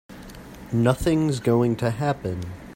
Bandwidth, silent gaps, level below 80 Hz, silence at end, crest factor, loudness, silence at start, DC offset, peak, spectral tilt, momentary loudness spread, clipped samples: 16.5 kHz; none; -44 dBFS; 0 s; 18 dB; -23 LUFS; 0.1 s; under 0.1%; -6 dBFS; -7 dB/octave; 20 LU; under 0.1%